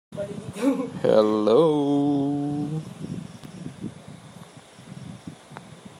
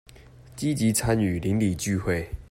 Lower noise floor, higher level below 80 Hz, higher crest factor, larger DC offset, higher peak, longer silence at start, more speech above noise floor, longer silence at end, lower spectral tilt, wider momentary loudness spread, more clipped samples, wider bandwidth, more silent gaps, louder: about the same, -46 dBFS vs -48 dBFS; second, -64 dBFS vs -44 dBFS; about the same, 20 dB vs 16 dB; neither; first, -6 dBFS vs -10 dBFS; about the same, 0.1 s vs 0.2 s; about the same, 26 dB vs 24 dB; about the same, 0.1 s vs 0.05 s; first, -7.5 dB/octave vs -5.5 dB/octave; first, 24 LU vs 7 LU; neither; second, 12.5 kHz vs 16 kHz; neither; about the same, -23 LUFS vs -25 LUFS